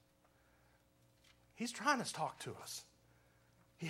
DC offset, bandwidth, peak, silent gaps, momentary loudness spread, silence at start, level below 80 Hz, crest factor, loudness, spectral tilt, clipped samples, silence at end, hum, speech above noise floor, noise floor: under 0.1%; 16 kHz; -18 dBFS; none; 13 LU; 1.55 s; -80 dBFS; 26 dB; -41 LUFS; -3 dB/octave; under 0.1%; 0 s; 60 Hz at -70 dBFS; 31 dB; -72 dBFS